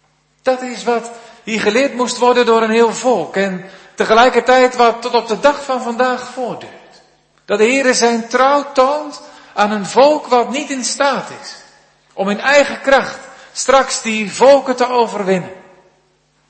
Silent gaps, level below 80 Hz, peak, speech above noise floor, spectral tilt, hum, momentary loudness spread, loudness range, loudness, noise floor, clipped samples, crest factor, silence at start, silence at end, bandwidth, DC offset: none; -54 dBFS; 0 dBFS; 44 dB; -3 dB/octave; none; 15 LU; 3 LU; -14 LUFS; -58 dBFS; under 0.1%; 14 dB; 0.45 s; 0.9 s; 8.8 kHz; under 0.1%